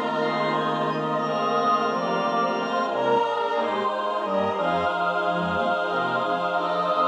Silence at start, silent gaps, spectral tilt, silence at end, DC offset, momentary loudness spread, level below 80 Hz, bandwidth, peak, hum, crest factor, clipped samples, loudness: 0 s; none; -6 dB/octave; 0 s; under 0.1%; 3 LU; -64 dBFS; 10.5 kHz; -10 dBFS; none; 14 dB; under 0.1%; -24 LUFS